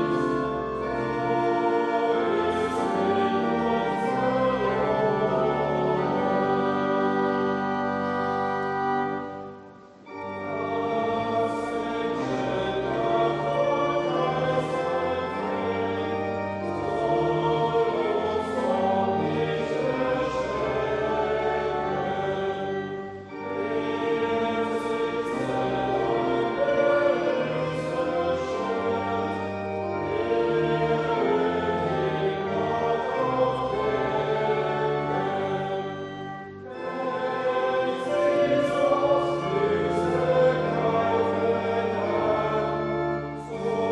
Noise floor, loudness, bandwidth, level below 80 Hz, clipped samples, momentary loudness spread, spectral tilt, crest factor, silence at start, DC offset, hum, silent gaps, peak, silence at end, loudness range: -47 dBFS; -26 LUFS; 10.5 kHz; -54 dBFS; under 0.1%; 6 LU; -6.5 dB/octave; 16 dB; 0 s; under 0.1%; none; none; -10 dBFS; 0 s; 4 LU